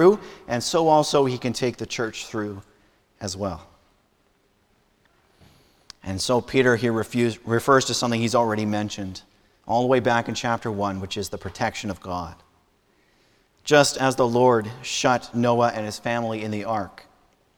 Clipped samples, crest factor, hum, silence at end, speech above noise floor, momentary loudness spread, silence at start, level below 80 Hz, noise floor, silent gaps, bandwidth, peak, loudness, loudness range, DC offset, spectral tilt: under 0.1%; 22 dB; none; 0.65 s; 42 dB; 14 LU; 0 s; -56 dBFS; -64 dBFS; none; 19.5 kHz; -2 dBFS; -23 LUFS; 12 LU; under 0.1%; -4.5 dB/octave